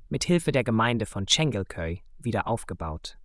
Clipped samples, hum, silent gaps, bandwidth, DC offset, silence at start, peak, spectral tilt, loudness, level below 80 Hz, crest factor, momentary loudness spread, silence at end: under 0.1%; none; none; 12 kHz; under 0.1%; 0 s; -8 dBFS; -4.5 dB/octave; -27 LUFS; -46 dBFS; 20 dB; 12 LU; 0 s